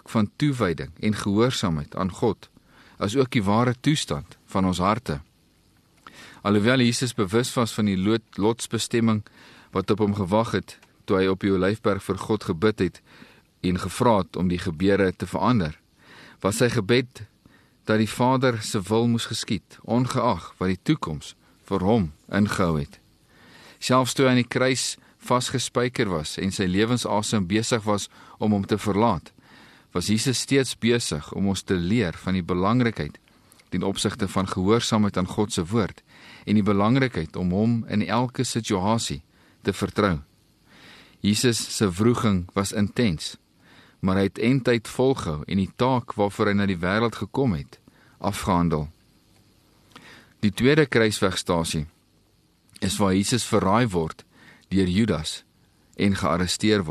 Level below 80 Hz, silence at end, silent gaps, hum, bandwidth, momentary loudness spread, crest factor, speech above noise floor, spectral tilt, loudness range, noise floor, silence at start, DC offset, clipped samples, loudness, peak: -50 dBFS; 0 s; none; none; 13 kHz; 9 LU; 18 dB; 39 dB; -5.5 dB/octave; 2 LU; -62 dBFS; 0.1 s; under 0.1%; under 0.1%; -24 LUFS; -6 dBFS